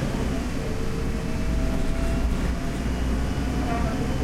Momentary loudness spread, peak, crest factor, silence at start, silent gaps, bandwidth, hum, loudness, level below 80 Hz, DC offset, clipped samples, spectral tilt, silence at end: 3 LU; -12 dBFS; 12 dB; 0 s; none; 14.5 kHz; none; -27 LUFS; -28 dBFS; under 0.1%; under 0.1%; -6.5 dB/octave; 0 s